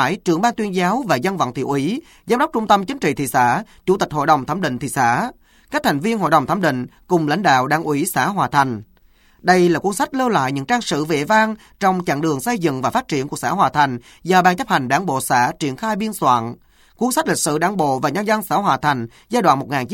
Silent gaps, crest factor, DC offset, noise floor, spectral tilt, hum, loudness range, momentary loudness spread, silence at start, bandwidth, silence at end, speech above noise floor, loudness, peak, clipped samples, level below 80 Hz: none; 18 dB; under 0.1%; -53 dBFS; -5 dB/octave; none; 1 LU; 6 LU; 0 s; 17 kHz; 0 s; 35 dB; -18 LUFS; 0 dBFS; under 0.1%; -52 dBFS